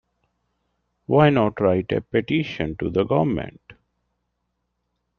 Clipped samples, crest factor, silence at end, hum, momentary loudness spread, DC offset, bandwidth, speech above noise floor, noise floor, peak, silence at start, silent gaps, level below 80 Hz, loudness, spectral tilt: under 0.1%; 22 dB; 1.45 s; 60 Hz at -50 dBFS; 11 LU; under 0.1%; 6.6 kHz; 55 dB; -75 dBFS; -2 dBFS; 1.1 s; none; -52 dBFS; -21 LUFS; -9 dB/octave